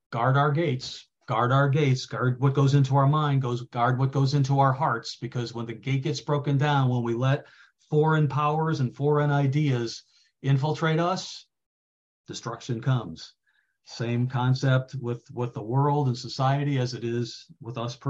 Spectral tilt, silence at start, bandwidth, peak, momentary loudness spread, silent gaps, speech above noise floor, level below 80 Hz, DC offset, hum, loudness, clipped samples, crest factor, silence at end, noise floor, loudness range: -7 dB/octave; 0.1 s; 7.8 kHz; -8 dBFS; 12 LU; 11.66-12.24 s; 42 dB; -64 dBFS; under 0.1%; none; -25 LUFS; under 0.1%; 16 dB; 0 s; -67 dBFS; 6 LU